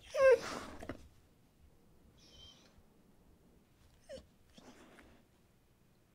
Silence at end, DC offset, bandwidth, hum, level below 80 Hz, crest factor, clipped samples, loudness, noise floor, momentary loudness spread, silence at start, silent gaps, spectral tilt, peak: 1.95 s; under 0.1%; 15 kHz; none; -66 dBFS; 22 dB; under 0.1%; -32 LUFS; -69 dBFS; 31 LU; 0.1 s; none; -3.5 dB/octave; -18 dBFS